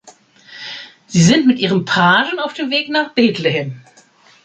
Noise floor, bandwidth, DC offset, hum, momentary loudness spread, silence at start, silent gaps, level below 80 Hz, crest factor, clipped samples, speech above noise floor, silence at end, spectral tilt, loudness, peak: -49 dBFS; 9.2 kHz; under 0.1%; none; 18 LU; 0.05 s; none; -56 dBFS; 16 dB; under 0.1%; 34 dB; 0.65 s; -4.5 dB/octave; -15 LUFS; -2 dBFS